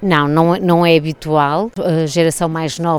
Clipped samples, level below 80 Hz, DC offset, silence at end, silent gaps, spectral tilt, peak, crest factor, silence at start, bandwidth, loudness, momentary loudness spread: under 0.1%; -46 dBFS; under 0.1%; 0 s; none; -6 dB/octave; 0 dBFS; 14 dB; 0 s; 17 kHz; -15 LUFS; 6 LU